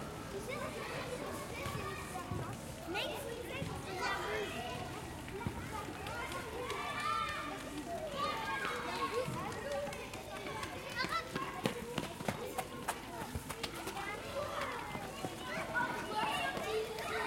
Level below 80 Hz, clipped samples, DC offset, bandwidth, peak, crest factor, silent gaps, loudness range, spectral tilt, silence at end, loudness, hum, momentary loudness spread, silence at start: -58 dBFS; under 0.1%; under 0.1%; 16.5 kHz; -16 dBFS; 24 dB; none; 3 LU; -4 dB/octave; 0 s; -40 LUFS; none; 6 LU; 0 s